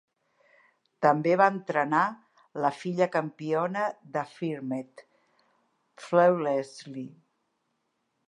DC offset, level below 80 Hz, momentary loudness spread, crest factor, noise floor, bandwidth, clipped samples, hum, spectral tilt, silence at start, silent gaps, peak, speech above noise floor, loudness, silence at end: under 0.1%; -84 dBFS; 18 LU; 22 dB; -77 dBFS; 11 kHz; under 0.1%; none; -7 dB/octave; 1 s; none; -6 dBFS; 50 dB; -27 LUFS; 1.2 s